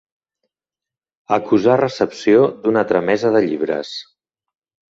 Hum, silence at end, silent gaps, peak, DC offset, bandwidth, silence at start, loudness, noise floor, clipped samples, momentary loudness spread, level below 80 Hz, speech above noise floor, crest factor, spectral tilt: none; 0.95 s; none; -2 dBFS; under 0.1%; 7.8 kHz; 1.3 s; -17 LUFS; -89 dBFS; under 0.1%; 8 LU; -60 dBFS; 73 dB; 16 dB; -6.5 dB/octave